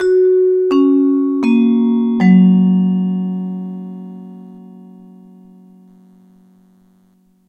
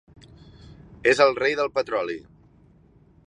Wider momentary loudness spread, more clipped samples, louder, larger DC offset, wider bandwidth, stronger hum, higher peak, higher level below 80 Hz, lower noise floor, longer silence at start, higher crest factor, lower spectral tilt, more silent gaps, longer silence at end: first, 21 LU vs 12 LU; neither; first, -13 LUFS vs -22 LUFS; neither; second, 5.6 kHz vs 10.5 kHz; neither; first, 0 dBFS vs -4 dBFS; second, -62 dBFS vs -56 dBFS; about the same, -54 dBFS vs -56 dBFS; second, 0 s vs 0.7 s; second, 14 dB vs 22 dB; first, -10 dB/octave vs -4 dB/octave; neither; first, 2.7 s vs 1.05 s